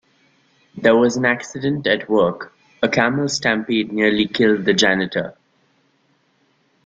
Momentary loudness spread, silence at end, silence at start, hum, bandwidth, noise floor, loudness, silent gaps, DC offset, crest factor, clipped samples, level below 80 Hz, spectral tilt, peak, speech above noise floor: 8 LU; 1.55 s; 0.75 s; none; 9.2 kHz; -62 dBFS; -18 LUFS; none; under 0.1%; 18 dB; under 0.1%; -56 dBFS; -4.5 dB/octave; 0 dBFS; 44 dB